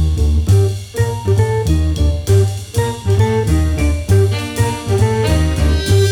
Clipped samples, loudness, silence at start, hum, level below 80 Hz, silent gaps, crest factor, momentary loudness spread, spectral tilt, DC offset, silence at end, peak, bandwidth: under 0.1%; -15 LUFS; 0 s; none; -20 dBFS; none; 14 dB; 5 LU; -6.5 dB/octave; under 0.1%; 0 s; 0 dBFS; 15.5 kHz